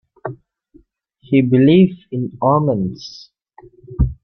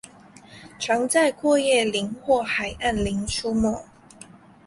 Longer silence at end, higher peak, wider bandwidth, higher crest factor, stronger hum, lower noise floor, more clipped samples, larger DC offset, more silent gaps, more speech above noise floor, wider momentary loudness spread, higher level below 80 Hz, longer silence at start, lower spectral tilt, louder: second, 0.1 s vs 0.85 s; first, -2 dBFS vs -6 dBFS; second, 6.4 kHz vs 11.5 kHz; about the same, 16 dB vs 18 dB; neither; first, -53 dBFS vs -48 dBFS; neither; neither; neither; first, 38 dB vs 26 dB; first, 21 LU vs 7 LU; first, -32 dBFS vs -44 dBFS; first, 0.25 s vs 0.05 s; first, -9 dB/octave vs -3.5 dB/octave; first, -16 LUFS vs -23 LUFS